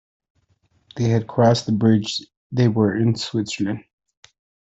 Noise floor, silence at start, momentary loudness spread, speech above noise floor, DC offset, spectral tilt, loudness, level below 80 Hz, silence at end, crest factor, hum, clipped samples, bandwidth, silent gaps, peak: -64 dBFS; 0.95 s; 11 LU; 45 dB; under 0.1%; -6.5 dB/octave; -20 LUFS; -56 dBFS; 0.9 s; 18 dB; none; under 0.1%; 8 kHz; 2.37-2.50 s; -4 dBFS